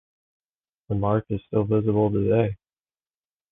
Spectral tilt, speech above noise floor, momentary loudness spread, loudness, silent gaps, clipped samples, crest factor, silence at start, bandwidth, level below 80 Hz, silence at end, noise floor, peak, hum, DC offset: -12 dB/octave; over 68 dB; 7 LU; -24 LUFS; none; under 0.1%; 18 dB; 0.9 s; 3.8 kHz; -48 dBFS; 0.95 s; under -90 dBFS; -8 dBFS; none; under 0.1%